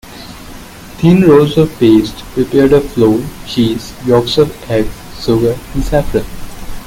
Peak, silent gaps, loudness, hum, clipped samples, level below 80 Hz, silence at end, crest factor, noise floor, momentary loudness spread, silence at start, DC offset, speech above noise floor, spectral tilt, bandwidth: 0 dBFS; none; -12 LUFS; none; under 0.1%; -28 dBFS; 0 s; 12 dB; -31 dBFS; 22 LU; 0.05 s; under 0.1%; 20 dB; -7 dB/octave; 17 kHz